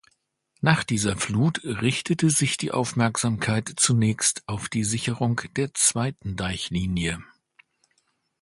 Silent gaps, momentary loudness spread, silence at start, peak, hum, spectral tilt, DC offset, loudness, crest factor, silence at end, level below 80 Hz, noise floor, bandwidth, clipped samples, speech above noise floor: none; 8 LU; 0.6 s; 0 dBFS; none; -4 dB/octave; under 0.1%; -24 LUFS; 24 dB; 1.15 s; -48 dBFS; -71 dBFS; 12 kHz; under 0.1%; 46 dB